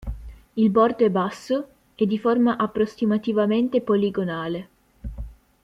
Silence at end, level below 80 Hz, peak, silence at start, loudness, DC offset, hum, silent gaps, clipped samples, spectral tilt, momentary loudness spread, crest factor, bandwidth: 0.3 s; -42 dBFS; -6 dBFS; 0 s; -22 LUFS; under 0.1%; none; none; under 0.1%; -7.5 dB/octave; 20 LU; 18 dB; 10.5 kHz